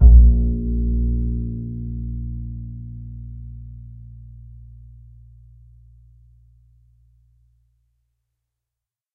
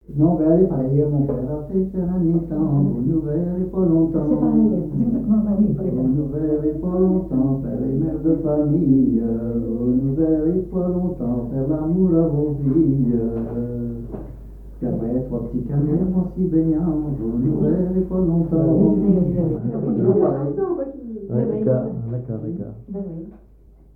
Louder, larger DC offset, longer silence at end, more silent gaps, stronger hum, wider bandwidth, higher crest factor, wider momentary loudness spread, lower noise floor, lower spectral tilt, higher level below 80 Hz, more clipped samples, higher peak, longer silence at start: about the same, -22 LUFS vs -20 LUFS; second, under 0.1% vs 0.2%; first, 5.05 s vs 0.6 s; neither; neither; second, 0.8 kHz vs 2.1 kHz; about the same, 20 dB vs 16 dB; first, 25 LU vs 10 LU; first, -87 dBFS vs -48 dBFS; first, -16 dB/octave vs -13.5 dB/octave; first, -22 dBFS vs -38 dBFS; neither; first, 0 dBFS vs -4 dBFS; about the same, 0 s vs 0.1 s